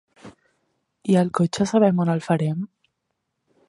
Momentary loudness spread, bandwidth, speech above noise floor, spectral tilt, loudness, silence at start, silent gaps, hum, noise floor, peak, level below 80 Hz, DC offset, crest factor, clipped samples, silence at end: 13 LU; 11 kHz; 57 dB; -7 dB/octave; -21 LUFS; 0.25 s; none; none; -77 dBFS; -4 dBFS; -62 dBFS; under 0.1%; 18 dB; under 0.1%; 1 s